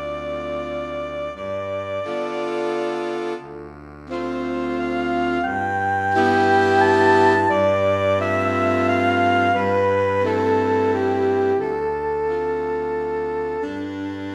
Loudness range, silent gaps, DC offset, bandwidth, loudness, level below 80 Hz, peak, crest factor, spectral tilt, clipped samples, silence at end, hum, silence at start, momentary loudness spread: 9 LU; none; under 0.1%; 11.5 kHz; -21 LUFS; -50 dBFS; -4 dBFS; 16 dB; -6.5 dB/octave; under 0.1%; 0 s; none; 0 s; 12 LU